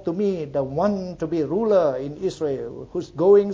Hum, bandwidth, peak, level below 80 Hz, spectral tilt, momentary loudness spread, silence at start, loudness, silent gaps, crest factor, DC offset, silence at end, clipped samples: none; 7.8 kHz; -6 dBFS; -52 dBFS; -8 dB/octave; 12 LU; 0 s; -23 LUFS; none; 16 dB; under 0.1%; 0 s; under 0.1%